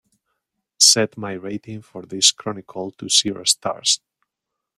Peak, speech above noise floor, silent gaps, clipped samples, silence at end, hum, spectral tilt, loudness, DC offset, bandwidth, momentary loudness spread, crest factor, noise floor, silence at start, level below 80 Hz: 0 dBFS; 60 dB; none; under 0.1%; 0.8 s; none; -1 dB/octave; -16 LUFS; under 0.1%; 16 kHz; 19 LU; 22 dB; -82 dBFS; 0.8 s; -66 dBFS